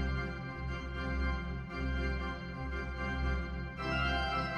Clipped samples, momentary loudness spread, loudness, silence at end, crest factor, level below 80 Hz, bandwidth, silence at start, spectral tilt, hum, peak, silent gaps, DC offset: under 0.1%; 7 LU; -37 LUFS; 0 s; 14 dB; -40 dBFS; 6.8 kHz; 0 s; -6.5 dB/octave; none; -20 dBFS; none; under 0.1%